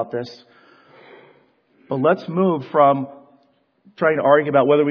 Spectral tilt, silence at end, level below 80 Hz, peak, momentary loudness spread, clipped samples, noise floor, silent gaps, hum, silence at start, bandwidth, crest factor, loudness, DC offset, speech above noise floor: -8.5 dB/octave; 0 s; -70 dBFS; 0 dBFS; 14 LU; under 0.1%; -61 dBFS; none; none; 0 s; 5.4 kHz; 20 dB; -18 LUFS; under 0.1%; 43 dB